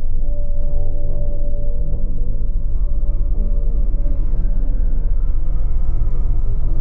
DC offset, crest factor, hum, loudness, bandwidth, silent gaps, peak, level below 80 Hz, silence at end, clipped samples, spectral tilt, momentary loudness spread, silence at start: under 0.1%; 6 dB; none; -24 LUFS; 1.3 kHz; none; -6 dBFS; -14 dBFS; 0 s; under 0.1%; -12 dB/octave; 3 LU; 0 s